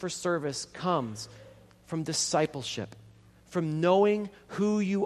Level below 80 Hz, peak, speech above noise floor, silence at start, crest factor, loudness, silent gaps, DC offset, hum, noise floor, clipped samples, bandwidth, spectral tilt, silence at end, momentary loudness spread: -66 dBFS; -10 dBFS; 27 dB; 0 s; 20 dB; -29 LUFS; none; under 0.1%; none; -56 dBFS; under 0.1%; 13 kHz; -4.5 dB/octave; 0 s; 14 LU